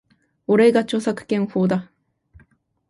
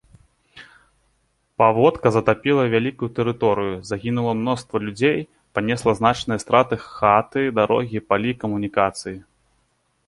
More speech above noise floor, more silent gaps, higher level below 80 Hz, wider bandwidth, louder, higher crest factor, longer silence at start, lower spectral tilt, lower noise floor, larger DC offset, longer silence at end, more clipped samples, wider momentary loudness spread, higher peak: second, 40 dB vs 47 dB; neither; second, -60 dBFS vs -52 dBFS; about the same, 11.5 kHz vs 11.5 kHz; about the same, -20 LUFS vs -20 LUFS; about the same, 16 dB vs 20 dB; about the same, 0.5 s vs 0.55 s; about the same, -6.5 dB/octave vs -6 dB/octave; second, -58 dBFS vs -67 dBFS; neither; first, 1.05 s vs 0.85 s; neither; about the same, 9 LU vs 9 LU; about the same, -4 dBFS vs -2 dBFS